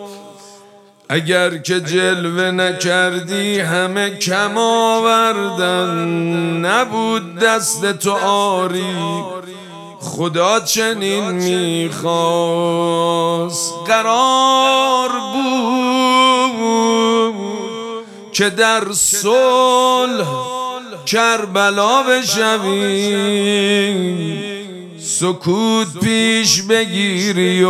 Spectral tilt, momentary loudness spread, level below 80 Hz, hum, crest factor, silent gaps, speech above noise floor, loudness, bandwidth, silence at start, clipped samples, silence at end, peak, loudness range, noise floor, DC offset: -3.5 dB/octave; 10 LU; -62 dBFS; none; 16 dB; none; 29 dB; -15 LUFS; 16 kHz; 0 s; under 0.1%; 0 s; 0 dBFS; 4 LU; -45 dBFS; under 0.1%